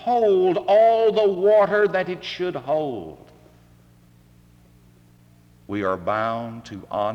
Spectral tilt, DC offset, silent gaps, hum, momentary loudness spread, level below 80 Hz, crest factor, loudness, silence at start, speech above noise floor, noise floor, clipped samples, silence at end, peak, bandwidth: -6.5 dB/octave; under 0.1%; none; none; 15 LU; -60 dBFS; 14 dB; -20 LUFS; 0 s; 33 dB; -53 dBFS; under 0.1%; 0 s; -8 dBFS; 7.8 kHz